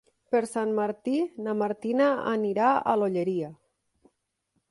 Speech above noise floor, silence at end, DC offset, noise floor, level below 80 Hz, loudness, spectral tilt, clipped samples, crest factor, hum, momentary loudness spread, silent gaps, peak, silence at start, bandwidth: 51 dB; 1.15 s; under 0.1%; -77 dBFS; -74 dBFS; -27 LUFS; -6.5 dB/octave; under 0.1%; 18 dB; none; 6 LU; none; -10 dBFS; 0.3 s; 11.5 kHz